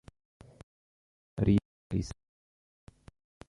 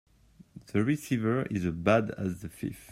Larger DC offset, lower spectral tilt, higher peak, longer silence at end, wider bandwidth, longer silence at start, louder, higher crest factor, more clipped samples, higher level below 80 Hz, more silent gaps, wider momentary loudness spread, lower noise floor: neither; about the same, -8 dB/octave vs -7 dB/octave; second, -14 dBFS vs -10 dBFS; first, 1.35 s vs 0 s; second, 11 kHz vs 16 kHz; first, 1.35 s vs 0.55 s; about the same, -32 LUFS vs -30 LUFS; about the same, 22 dB vs 20 dB; neither; first, -50 dBFS vs -58 dBFS; first, 1.65-1.90 s vs none; first, 18 LU vs 11 LU; first, under -90 dBFS vs -55 dBFS